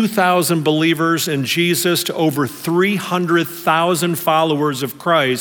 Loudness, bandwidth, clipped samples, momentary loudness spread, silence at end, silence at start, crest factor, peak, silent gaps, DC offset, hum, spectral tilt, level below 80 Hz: -16 LUFS; over 20 kHz; under 0.1%; 4 LU; 0 s; 0 s; 16 dB; -2 dBFS; none; under 0.1%; none; -4.5 dB/octave; -66 dBFS